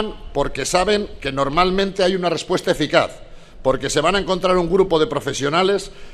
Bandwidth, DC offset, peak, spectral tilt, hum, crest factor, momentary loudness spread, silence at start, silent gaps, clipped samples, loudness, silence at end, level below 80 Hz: 14 kHz; under 0.1%; 0 dBFS; -4.5 dB/octave; none; 20 dB; 7 LU; 0 s; none; under 0.1%; -19 LUFS; 0 s; -36 dBFS